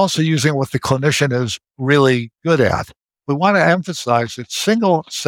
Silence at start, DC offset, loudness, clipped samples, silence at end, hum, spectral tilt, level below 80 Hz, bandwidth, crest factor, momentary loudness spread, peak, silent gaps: 0 s; under 0.1%; -17 LUFS; under 0.1%; 0 s; none; -5 dB/octave; -48 dBFS; 17 kHz; 16 dB; 10 LU; -2 dBFS; none